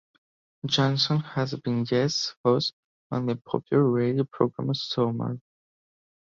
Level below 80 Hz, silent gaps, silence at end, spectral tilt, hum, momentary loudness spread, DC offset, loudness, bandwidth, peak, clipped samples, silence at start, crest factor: -64 dBFS; 2.37-2.44 s, 2.73-3.10 s; 1 s; -6 dB/octave; none; 8 LU; under 0.1%; -26 LUFS; 7.6 kHz; -8 dBFS; under 0.1%; 0.65 s; 20 dB